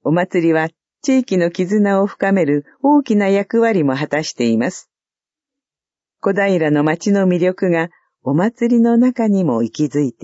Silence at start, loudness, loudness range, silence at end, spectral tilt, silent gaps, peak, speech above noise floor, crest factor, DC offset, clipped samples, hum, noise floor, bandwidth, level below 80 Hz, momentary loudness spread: 0.05 s; -16 LUFS; 4 LU; 0.1 s; -6.5 dB/octave; none; -2 dBFS; over 75 dB; 14 dB; under 0.1%; under 0.1%; none; under -90 dBFS; 8 kHz; -66 dBFS; 6 LU